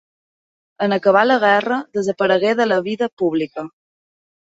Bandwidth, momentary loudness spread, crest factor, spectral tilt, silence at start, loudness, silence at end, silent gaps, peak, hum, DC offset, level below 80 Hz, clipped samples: 7.8 kHz; 10 LU; 18 dB; -5.5 dB/octave; 0.8 s; -17 LUFS; 0.9 s; 3.13-3.17 s; -2 dBFS; none; under 0.1%; -66 dBFS; under 0.1%